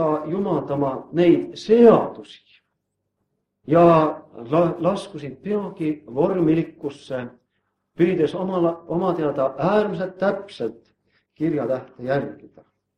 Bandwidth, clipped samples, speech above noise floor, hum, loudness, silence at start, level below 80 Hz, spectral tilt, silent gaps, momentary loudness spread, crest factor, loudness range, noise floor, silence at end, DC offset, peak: 9.8 kHz; under 0.1%; 56 dB; none; -21 LUFS; 0 s; -60 dBFS; -8.5 dB/octave; none; 16 LU; 20 dB; 5 LU; -77 dBFS; 0.65 s; under 0.1%; -2 dBFS